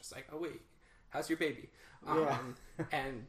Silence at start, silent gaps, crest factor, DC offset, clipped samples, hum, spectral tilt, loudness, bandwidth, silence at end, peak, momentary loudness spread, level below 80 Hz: 0 s; none; 18 dB; under 0.1%; under 0.1%; none; -5 dB/octave; -38 LUFS; 15.5 kHz; 0 s; -20 dBFS; 16 LU; -62 dBFS